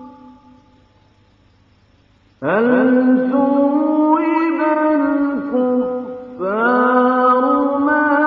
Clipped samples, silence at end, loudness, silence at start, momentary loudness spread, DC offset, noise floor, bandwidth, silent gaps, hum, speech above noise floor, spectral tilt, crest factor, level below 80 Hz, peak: under 0.1%; 0 s; -16 LUFS; 0 s; 7 LU; under 0.1%; -53 dBFS; 4.8 kHz; none; none; 39 dB; -9 dB/octave; 14 dB; -60 dBFS; -2 dBFS